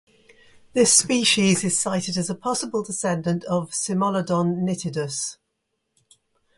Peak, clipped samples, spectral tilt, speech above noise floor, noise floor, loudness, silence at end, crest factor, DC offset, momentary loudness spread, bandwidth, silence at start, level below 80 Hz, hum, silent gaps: -4 dBFS; under 0.1%; -3.5 dB/octave; 54 dB; -76 dBFS; -22 LUFS; 1.25 s; 20 dB; under 0.1%; 11 LU; 11.5 kHz; 0.75 s; -62 dBFS; none; none